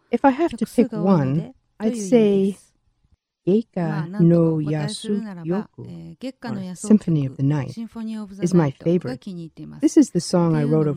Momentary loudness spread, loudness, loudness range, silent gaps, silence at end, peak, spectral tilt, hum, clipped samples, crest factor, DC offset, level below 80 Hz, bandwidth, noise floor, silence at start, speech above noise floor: 16 LU; -21 LUFS; 3 LU; none; 0 s; -4 dBFS; -7.5 dB/octave; none; under 0.1%; 18 dB; under 0.1%; -56 dBFS; 12 kHz; -64 dBFS; 0.1 s; 44 dB